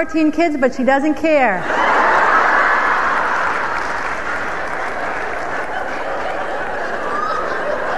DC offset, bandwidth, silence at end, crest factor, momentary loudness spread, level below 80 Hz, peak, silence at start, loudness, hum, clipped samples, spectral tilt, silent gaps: 4%; 12.5 kHz; 0 s; 16 dB; 10 LU; -44 dBFS; -2 dBFS; 0 s; -17 LUFS; none; under 0.1%; -4.5 dB/octave; none